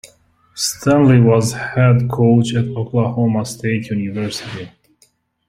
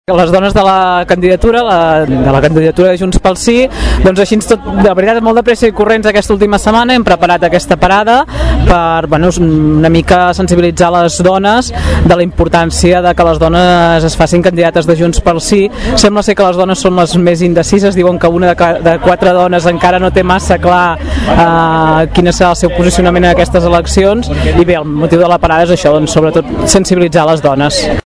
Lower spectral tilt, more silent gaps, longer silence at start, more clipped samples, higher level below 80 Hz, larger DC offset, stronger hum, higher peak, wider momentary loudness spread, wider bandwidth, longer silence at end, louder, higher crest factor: about the same, -6.5 dB/octave vs -5.5 dB/octave; neither; about the same, 0.05 s vs 0.1 s; second, under 0.1% vs 4%; second, -50 dBFS vs -20 dBFS; second, under 0.1% vs 0.3%; neither; about the same, -2 dBFS vs 0 dBFS; first, 14 LU vs 3 LU; first, 15 kHz vs 11 kHz; first, 0.8 s vs 0.05 s; second, -16 LUFS vs -8 LUFS; first, 14 dB vs 8 dB